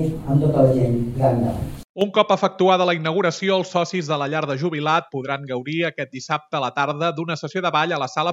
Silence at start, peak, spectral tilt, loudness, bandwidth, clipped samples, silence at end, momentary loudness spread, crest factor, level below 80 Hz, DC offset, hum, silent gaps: 0 s; -2 dBFS; -6 dB/octave; -21 LUFS; 14 kHz; under 0.1%; 0 s; 9 LU; 18 dB; -46 dBFS; under 0.1%; none; 1.89-1.94 s